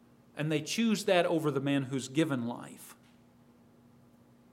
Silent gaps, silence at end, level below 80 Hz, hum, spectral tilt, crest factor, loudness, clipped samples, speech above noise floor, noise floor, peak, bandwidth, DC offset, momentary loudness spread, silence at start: none; 1.6 s; -80 dBFS; 60 Hz at -60 dBFS; -5 dB/octave; 22 dB; -31 LUFS; under 0.1%; 30 dB; -61 dBFS; -10 dBFS; 16 kHz; under 0.1%; 21 LU; 0.35 s